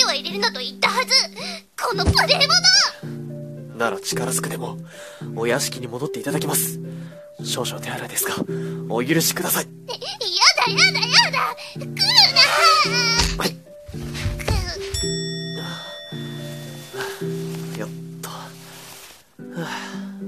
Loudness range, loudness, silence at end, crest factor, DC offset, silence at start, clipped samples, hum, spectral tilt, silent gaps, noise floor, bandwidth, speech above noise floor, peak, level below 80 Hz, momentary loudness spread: 16 LU; -18 LUFS; 0 s; 22 dB; 0.1%; 0 s; under 0.1%; none; -2.5 dB/octave; none; -43 dBFS; 14.5 kHz; 23 dB; 0 dBFS; -40 dBFS; 20 LU